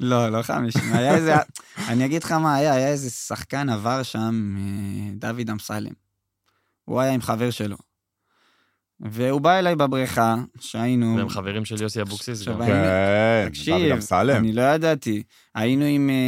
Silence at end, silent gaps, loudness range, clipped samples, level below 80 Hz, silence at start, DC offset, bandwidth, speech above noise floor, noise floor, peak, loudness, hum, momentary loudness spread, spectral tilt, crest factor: 0 s; none; 7 LU; under 0.1%; -56 dBFS; 0 s; under 0.1%; 16.5 kHz; 51 dB; -72 dBFS; -4 dBFS; -22 LUFS; none; 11 LU; -6 dB/octave; 18 dB